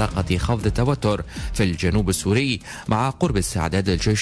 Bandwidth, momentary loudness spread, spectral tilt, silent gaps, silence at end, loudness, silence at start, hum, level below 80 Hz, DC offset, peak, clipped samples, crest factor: 11 kHz; 4 LU; -5.5 dB/octave; none; 0 s; -22 LUFS; 0 s; none; -32 dBFS; under 0.1%; -8 dBFS; under 0.1%; 12 dB